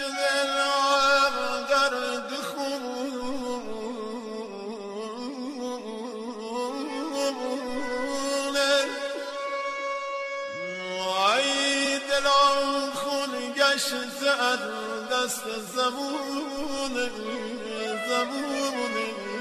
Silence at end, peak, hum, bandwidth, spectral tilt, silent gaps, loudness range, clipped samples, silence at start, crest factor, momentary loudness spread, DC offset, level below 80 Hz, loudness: 0 s; -8 dBFS; none; 13 kHz; -1.5 dB/octave; none; 10 LU; under 0.1%; 0 s; 20 dB; 13 LU; under 0.1%; -60 dBFS; -27 LUFS